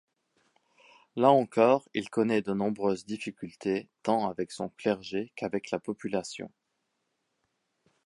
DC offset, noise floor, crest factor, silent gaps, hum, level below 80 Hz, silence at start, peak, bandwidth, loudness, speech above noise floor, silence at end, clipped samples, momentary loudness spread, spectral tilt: under 0.1%; -80 dBFS; 22 dB; none; none; -70 dBFS; 1.15 s; -8 dBFS; 11.5 kHz; -29 LUFS; 51 dB; 1.6 s; under 0.1%; 14 LU; -6 dB/octave